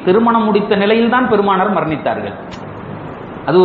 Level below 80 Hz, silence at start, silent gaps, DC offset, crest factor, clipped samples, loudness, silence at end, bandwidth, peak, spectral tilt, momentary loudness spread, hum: -48 dBFS; 0 s; none; under 0.1%; 14 dB; under 0.1%; -14 LUFS; 0 s; 6.8 kHz; 0 dBFS; -8.5 dB/octave; 17 LU; none